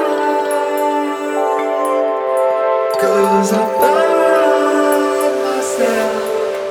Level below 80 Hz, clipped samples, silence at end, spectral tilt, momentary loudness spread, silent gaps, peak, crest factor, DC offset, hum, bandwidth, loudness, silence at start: -62 dBFS; under 0.1%; 0 s; -4 dB/octave; 5 LU; none; -2 dBFS; 14 dB; under 0.1%; none; 18.5 kHz; -15 LUFS; 0 s